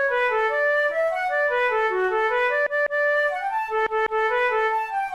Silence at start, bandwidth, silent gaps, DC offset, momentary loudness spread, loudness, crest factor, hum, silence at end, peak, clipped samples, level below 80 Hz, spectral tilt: 0 s; 13 kHz; none; 0.1%; 3 LU; -22 LUFS; 10 dB; none; 0 s; -12 dBFS; under 0.1%; -58 dBFS; -3 dB/octave